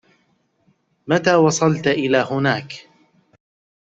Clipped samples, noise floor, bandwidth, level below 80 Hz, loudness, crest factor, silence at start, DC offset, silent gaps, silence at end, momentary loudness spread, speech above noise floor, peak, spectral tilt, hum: under 0.1%; -64 dBFS; 8.2 kHz; -60 dBFS; -18 LUFS; 18 dB; 1.05 s; under 0.1%; none; 1.15 s; 21 LU; 47 dB; -2 dBFS; -5 dB/octave; none